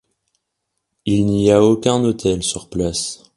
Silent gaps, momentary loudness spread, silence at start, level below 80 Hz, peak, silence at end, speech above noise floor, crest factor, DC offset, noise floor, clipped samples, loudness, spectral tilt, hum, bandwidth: none; 9 LU; 1.05 s; -42 dBFS; 0 dBFS; 0.2 s; 59 dB; 18 dB; under 0.1%; -76 dBFS; under 0.1%; -17 LUFS; -5.5 dB/octave; none; 11.5 kHz